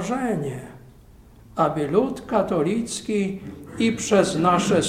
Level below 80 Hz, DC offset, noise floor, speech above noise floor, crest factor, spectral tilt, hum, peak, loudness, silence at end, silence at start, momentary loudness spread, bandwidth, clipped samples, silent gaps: -50 dBFS; under 0.1%; -48 dBFS; 26 dB; 18 dB; -5 dB/octave; none; -4 dBFS; -22 LUFS; 0 s; 0 s; 15 LU; 15.5 kHz; under 0.1%; none